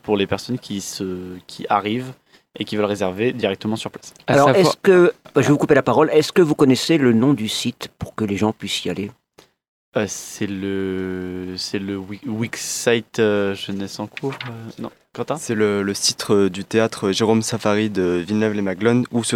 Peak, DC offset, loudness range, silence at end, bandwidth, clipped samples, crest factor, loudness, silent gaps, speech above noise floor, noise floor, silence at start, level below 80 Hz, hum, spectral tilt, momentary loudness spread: -2 dBFS; under 0.1%; 9 LU; 0 s; 17 kHz; under 0.1%; 18 dB; -20 LUFS; 9.68-9.92 s; 35 dB; -54 dBFS; 0.05 s; -56 dBFS; none; -5 dB/octave; 14 LU